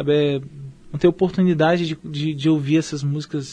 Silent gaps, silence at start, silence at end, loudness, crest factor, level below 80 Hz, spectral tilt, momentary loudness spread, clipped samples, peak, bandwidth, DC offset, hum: none; 0 s; 0 s; -20 LUFS; 16 dB; -52 dBFS; -7 dB/octave; 10 LU; under 0.1%; -4 dBFS; 10 kHz; under 0.1%; none